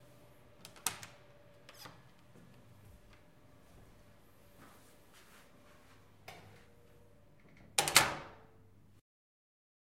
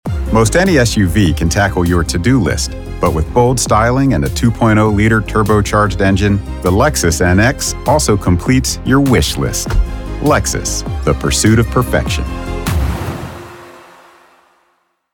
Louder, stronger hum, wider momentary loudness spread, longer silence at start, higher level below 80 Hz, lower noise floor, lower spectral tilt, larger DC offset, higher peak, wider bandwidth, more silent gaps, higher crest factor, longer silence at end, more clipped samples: second, -32 LUFS vs -13 LUFS; neither; first, 32 LU vs 8 LU; first, 0.85 s vs 0.05 s; second, -68 dBFS vs -22 dBFS; about the same, -64 dBFS vs -61 dBFS; second, -0.5 dB/octave vs -5 dB/octave; neither; second, -6 dBFS vs -2 dBFS; second, 16 kHz vs 18.5 kHz; neither; first, 36 dB vs 12 dB; first, 1.65 s vs 1.35 s; neither